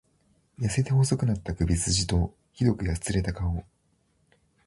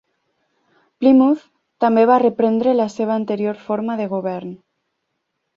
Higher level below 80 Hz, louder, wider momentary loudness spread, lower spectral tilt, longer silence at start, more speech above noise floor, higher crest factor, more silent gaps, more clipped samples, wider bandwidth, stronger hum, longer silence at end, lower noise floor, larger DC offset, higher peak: first, -38 dBFS vs -64 dBFS; second, -27 LUFS vs -17 LUFS; second, 8 LU vs 11 LU; second, -5 dB/octave vs -7.5 dB/octave; second, 0.6 s vs 1 s; second, 43 dB vs 58 dB; about the same, 18 dB vs 16 dB; neither; neither; first, 11.5 kHz vs 7.4 kHz; neither; about the same, 1.05 s vs 1 s; second, -69 dBFS vs -74 dBFS; neither; second, -10 dBFS vs -2 dBFS